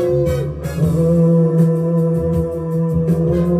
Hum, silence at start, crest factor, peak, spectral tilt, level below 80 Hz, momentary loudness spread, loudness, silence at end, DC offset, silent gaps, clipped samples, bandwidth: none; 0 s; 12 dB; -4 dBFS; -9.5 dB/octave; -36 dBFS; 6 LU; -16 LUFS; 0 s; under 0.1%; none; under 0.1%; 13 kHz